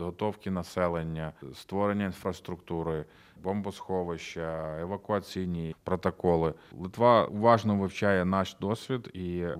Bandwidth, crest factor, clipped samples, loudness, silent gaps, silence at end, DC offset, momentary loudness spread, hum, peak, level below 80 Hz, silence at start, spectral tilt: 15 kHz; 22 dB; under 0.1%; -30 LUFS; none; 0 s; under 0.1%; 13 LU; none; -8 dBFS; -56 dBFS; 0 s; -7 dB/octave